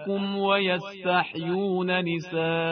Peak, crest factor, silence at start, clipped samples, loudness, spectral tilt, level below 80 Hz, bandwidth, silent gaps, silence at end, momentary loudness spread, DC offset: -10 dBFS; 16 dB; 0 s; under 0.1%; -26 LUFS; -7 dB/octave; -68 dBFS; 6.6 kHz; none; 0 s; 5 LU; under 0.1%